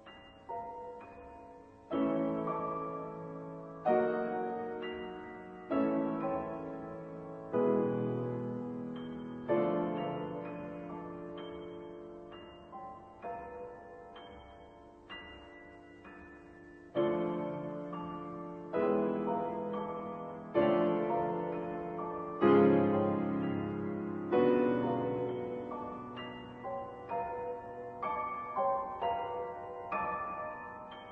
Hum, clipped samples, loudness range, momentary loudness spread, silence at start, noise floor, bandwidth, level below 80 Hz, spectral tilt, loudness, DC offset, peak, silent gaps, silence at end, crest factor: none; under 0.1%; 16 LU; 20 LU; 0 s; -55 dBFS; 4.9 kHz; -66 dBFS; -9.5 dB/octave; -35 LUFS; under 0.1%; -14 dBFS; none; 0 s; 22 dB